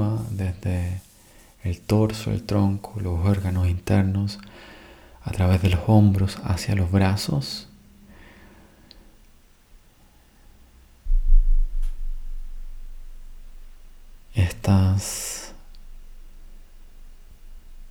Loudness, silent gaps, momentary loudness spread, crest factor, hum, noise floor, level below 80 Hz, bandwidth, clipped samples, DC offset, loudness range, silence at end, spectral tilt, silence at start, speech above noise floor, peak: -24 LUFS; none; 22 LU; 20 dB; none; -54 dBFS; -28 dBFS; 16.5 kHz; under 0.1%; under 0.1%; 10 LU; 0 s; -6.5 dB/octave; 0 s; 33 dB; -4 dBFS